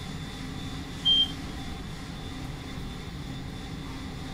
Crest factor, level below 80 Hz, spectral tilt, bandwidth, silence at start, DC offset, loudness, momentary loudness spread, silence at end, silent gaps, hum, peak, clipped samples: 18 dB; -44 dBFS; -4 dB/octave; 16 kHz; 0 s; under 0.1%; -31 LUFS; 16 LU; 0 s; none; none; -14 dBFS; under 0.1%